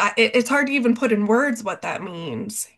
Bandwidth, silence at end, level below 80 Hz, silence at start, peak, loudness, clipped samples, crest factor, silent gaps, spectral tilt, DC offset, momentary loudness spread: 12.5 kHz; 0.1 s; -68 dBFS; 0 s; -4 dBFS; -21 LUFS; under 0.1%; 16 dB; none; -4 dB/octave; under 0.1%; 12 LU